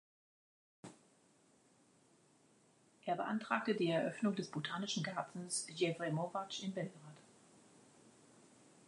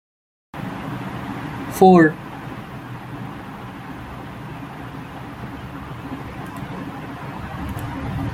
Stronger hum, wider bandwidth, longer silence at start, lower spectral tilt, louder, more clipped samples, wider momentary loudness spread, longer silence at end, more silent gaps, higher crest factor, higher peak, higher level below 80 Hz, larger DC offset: neither; second, 11 kHz vs 16 kHz; first, 0.85 s vs 0.55 s; second, -4.5 dB/octave vs -7 dB/octave; second, -40 LUFS vs -23 LUFS; neither; first, 23 LU vs 19 LU; first, 0.8 s vs 0 s; neither; about the same, 22 dB vs 22 dB; second, -22 dBFS vs -2 dBFS; second, -90 dBFS vs -44 dBFS; neither